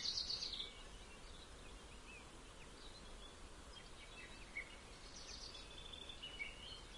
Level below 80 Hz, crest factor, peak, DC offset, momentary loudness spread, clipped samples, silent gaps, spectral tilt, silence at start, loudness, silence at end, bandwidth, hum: -60 dBFS; 22 dB; -30 dBFS; under 0.1%; 14 LU; under 0.1%; none; -1.5 dB/octave; 0 s; -51 LUFS; 0 s; 11.5 kHz; none